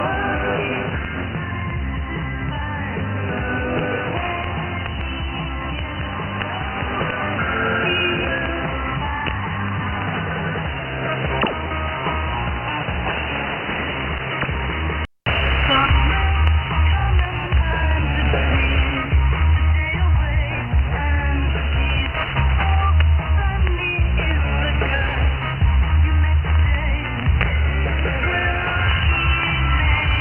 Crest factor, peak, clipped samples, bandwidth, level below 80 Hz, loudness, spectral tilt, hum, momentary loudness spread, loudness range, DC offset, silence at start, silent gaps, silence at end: 18 dB; -2 dBFS; under 0.1%; 3.3 kHz; -22 dBFS; -20 LUFS; -9 dB/octave; none; 8 LU; 5 LU; under 0.1%; 0 s; none; 0 s